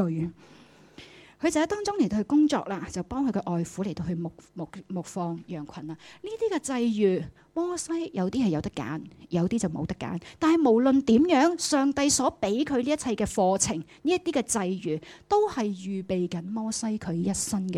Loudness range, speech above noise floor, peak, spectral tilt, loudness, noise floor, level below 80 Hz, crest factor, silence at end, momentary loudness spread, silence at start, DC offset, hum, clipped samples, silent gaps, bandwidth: 8 LU; 24 dB; -10 dBFS; -5 dB/octave; -27 LUFS; -51 dBFS; -56 dBFS; 16 dB; 0 s; 14 LU; 0 s; under 0.1%; none; under 0.1%; none; 15 kHz